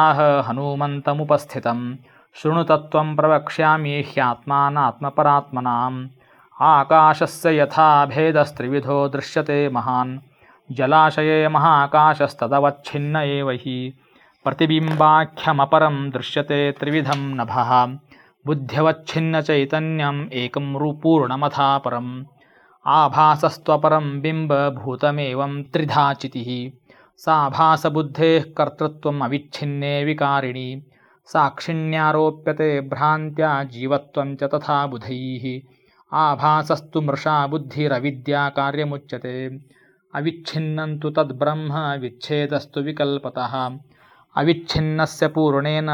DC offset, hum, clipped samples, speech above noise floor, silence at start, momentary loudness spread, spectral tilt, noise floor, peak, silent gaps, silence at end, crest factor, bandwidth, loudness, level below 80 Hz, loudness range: under 0.1%; none; under 0.1%; 35 dB; 0 s; 12 LU; -7 dB/octave; -54 dBFS; -2 dBFS; none; 0 s; 18 dB; 12.5 kHz; -20 LUFS; -58 dBFS; 6 LU